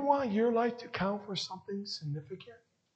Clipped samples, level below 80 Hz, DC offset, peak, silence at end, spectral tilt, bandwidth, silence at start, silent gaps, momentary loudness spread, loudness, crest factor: under 0.1%; -70 dBFS; under 0.1%; -14 dBFS; 0.4 s; -5.5 dB/octave; 8.6 kHz; 0 s; none; 13 LU; -34 LUFS; 20 dB